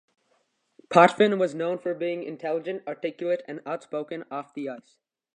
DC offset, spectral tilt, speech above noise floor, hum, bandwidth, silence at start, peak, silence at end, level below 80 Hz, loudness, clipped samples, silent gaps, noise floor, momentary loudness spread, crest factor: under 0.1%; -6 dB/octave; 45 dB; none; 10 kHz; 0.9 s; -2 dBFS; 0.55 s; -78 dBFS; -26 LUFS; under 0.1%; none; -71 dBFS; 17 LU; 24 dB